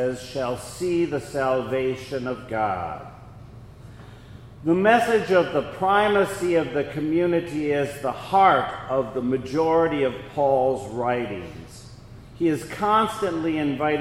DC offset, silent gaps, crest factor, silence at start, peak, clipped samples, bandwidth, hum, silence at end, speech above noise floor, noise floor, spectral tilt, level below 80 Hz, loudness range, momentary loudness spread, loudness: under 0.1%; none; 20 dB; 0 s; -4 dBFS; under 0.1%; 16 kHz; none; 0 s; 20 dB; -43 dBFS; -6 dB/octave; -50 dBFS; 6 LU; 11 LU; -23 LUFS